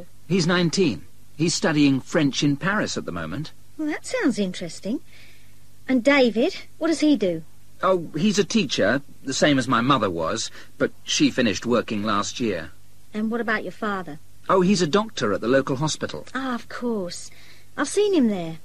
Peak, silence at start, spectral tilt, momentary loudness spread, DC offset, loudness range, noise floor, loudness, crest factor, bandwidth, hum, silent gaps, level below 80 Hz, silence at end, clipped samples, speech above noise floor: -4 dBFS; 0 s; -4.5 dB/octave; 12 LU; 1%; 4 LU; -53 dBFS; -23 LUFS; 18 dB; 14 kHz; none; none; -54 dBFS; 0.05 s; under 0.1%; 31 dB